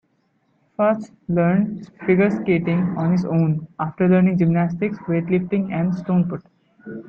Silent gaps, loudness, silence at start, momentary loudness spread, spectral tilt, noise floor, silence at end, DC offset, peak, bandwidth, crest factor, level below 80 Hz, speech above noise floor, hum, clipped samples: none; -20 LUFS; 0.8 s; 9 LU; -10 dB/octave; -65 dBFS; 0.05 s; under 0.1%; -4 dBFS; 5.8 kHz; 16 dB; -56 dBFS; 46 dB; none; under 0.1%